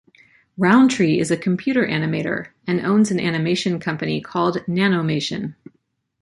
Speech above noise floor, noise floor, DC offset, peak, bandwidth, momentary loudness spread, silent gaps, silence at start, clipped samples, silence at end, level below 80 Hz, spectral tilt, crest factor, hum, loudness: 35 dB; -54 dBFS; under 0.1%; -2 dBFS; 11.5 kHz; 9 LU; none; 0.6 s; under 0.1%; 0.7 s; -60 dBFS; -6 dB/octave; 18 dB; none; -20 LUFS